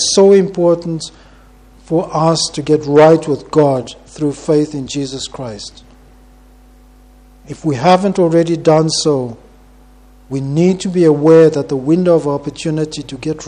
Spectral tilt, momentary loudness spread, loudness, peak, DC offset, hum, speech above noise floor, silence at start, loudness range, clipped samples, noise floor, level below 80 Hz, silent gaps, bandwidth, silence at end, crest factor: -5.5 dB/octave; 16 LU; -13 LUFS; 0 dBFS; under 0.1%; none; 30 dB; 0 s; 8 LU; under 0.1%; -43 dBFS; -46 dBFS; none; 10.5 kHz; 0 s; 14 dB